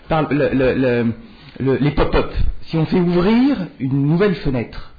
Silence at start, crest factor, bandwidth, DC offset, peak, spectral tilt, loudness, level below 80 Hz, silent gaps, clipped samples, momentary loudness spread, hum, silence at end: 0.1 s; 12 dB; 5 kHz; under 0.1%; -4 dBFS; -10 dB/octave; -18 LUFS; -28 dBFS; none; under 0.1%; 8 LU; none; 0.05 s